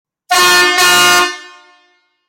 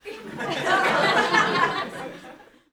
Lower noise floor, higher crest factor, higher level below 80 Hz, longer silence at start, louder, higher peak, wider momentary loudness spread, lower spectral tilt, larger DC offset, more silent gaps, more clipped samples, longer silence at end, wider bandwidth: first, -56 dBFS vs -47 dBFS; second, 12 dB vs 18 dB; first, -52 dBFS vs -62 dBFS; first, 0.3 s vs 0.05 s; first, -8 LUFS vs -21 LUFS; first, -2 dBFS vs -6 dBFS; second, 9 LU vs 18 LU; second, 0 dB/octave vs -3.5 dB/octave; neither; neither; neither; first, 0.8 s vs 0.3 s; second, 17 kHz vs over 20 kHz